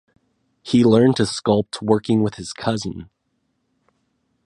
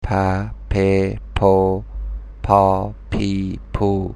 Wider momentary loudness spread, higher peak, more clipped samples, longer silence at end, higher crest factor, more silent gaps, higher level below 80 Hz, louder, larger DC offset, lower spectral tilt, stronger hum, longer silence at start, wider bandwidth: about the same, 14 LU vs 12 LU; about the same, -2 dBFS vs 0 dBFS; neither; first, 1.4 s vs 0 s; about the same, 20 dB vs 18 dB; neither; second, -52 dBFS vs -30 dBFS; about the same, -19 LUFS vs -19 LUFS; neither; second, -6 dB/octave vs -8 dB/octave; neither; first, 0.65 s vs 0 s; about the same, 11 kHz vs 10.5 kHz